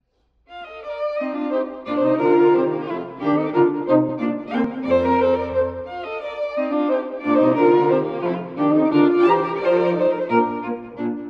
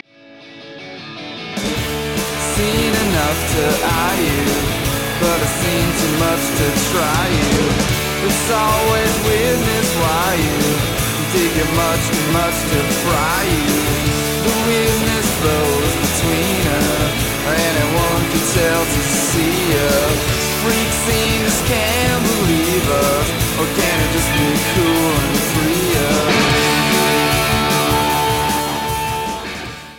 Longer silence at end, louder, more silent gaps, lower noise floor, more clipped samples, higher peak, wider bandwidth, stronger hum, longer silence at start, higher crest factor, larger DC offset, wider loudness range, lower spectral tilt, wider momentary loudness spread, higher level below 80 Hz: about the same, 0 s vs 0 s; second, -20 LUFS vs -16 LUFS; neither; first, -61 dBFS vs -41 dBFS; neither; about the same, -4 dBFS vs -2 dBFS; second, 5.6 kHz vs 17 kHz; neither; first, 0.5 s vs 0.3 s; about the same, 16 dB vs 14 dB; second, under 0.1% vs 0.2%; about the same, 3 LU vs 2 LU; first, -8.5 dB/octave vs -4 dB/octave; first, 12 LU vs 4 LU; second, -54 dBFS vs -30 dBFS